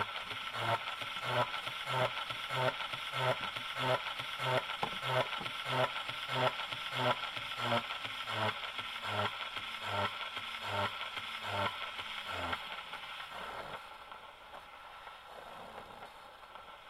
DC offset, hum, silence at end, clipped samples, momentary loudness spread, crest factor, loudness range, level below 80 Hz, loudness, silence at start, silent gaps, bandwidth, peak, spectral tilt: under 0.1%; none; 0 s; under 0.1%; 16 LU; 22 dB; 9 LU; -68 dBFS; -36 LUFS; 0 s; none; 16.5 kHz; -16 dBFS; -4 dB/octave